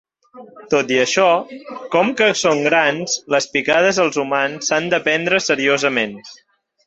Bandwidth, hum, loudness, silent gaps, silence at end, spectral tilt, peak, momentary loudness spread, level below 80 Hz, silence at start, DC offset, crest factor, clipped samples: 8.2 kHz; none; -17 LUFS; none; 0.55 s; -3 dB/octave; -2 dBFS; 6 LU; -62 dBFS; 0.35 s; under 0.1%; 16 dB; under 0.1%